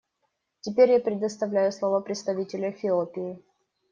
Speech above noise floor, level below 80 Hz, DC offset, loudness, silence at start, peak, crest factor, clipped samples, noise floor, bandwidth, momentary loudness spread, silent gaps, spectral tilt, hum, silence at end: 52 dB; -74 dBFS; under 0.1%; -26 LUFS; 0.65 s; -8 dBFS; 20 dB; under 0.1%; -77 dBFS; 7.4 kHz; 15 LU; none; -5.5 dB/octave; none; 0.55 s